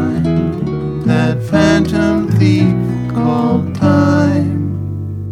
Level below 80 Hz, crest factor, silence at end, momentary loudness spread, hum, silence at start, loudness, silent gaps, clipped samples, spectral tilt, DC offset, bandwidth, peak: -36 dBFS; 14 dB; 0 s; 8 LU; none; 0 s; -14 LUFS; none; under 0.1%; -7.5 dB/octave; under 0.1%; 12 kHz; 0 dBFS